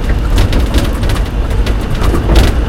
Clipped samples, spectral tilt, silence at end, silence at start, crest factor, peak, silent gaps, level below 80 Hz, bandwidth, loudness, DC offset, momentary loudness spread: 0.4%; -6 dB/octave; 0 s; 0 s; 10 dB; 0 dBFS; none; -12 dBFS; 16 kHz; -14 LUFS; under 0.1%; 5 LU